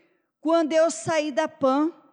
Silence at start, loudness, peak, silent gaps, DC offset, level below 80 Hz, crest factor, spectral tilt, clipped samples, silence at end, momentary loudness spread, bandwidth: 0.45 s; -23 LUFS; -12 dBFS; none; under 0.1%; -78 dBFS; 12 dB; -4 dB/octave; under 0.1%; 0.2 s; 5 LU; 10.5 kHz